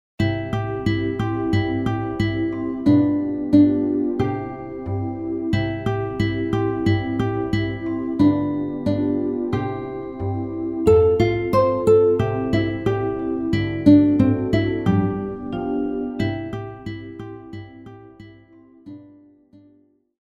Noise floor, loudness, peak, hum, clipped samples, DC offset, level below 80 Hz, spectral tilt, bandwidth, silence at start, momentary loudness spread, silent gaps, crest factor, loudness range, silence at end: -58 dBFS; -21 LUFS; -2 dBFS; none; under 0.1%; under 0.1%; -42 dBFS; -8.5 dB/octave; 10.5 kHz; 0.2 s; 15 LU; none; 18 dB; 10 LU; 1.15 s